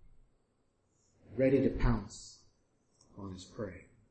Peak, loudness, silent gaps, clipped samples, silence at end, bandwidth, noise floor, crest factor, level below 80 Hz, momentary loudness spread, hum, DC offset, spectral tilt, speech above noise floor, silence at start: -16 dBFS; -33 LUFS; none; under 0.1%; 0.3 s; 8.8 kHz; -75 dBFS; 20 dB; -44 dBFS; 21 LU; none; under 0.1%; -7 dB/octave; 43 dB; 1.3 s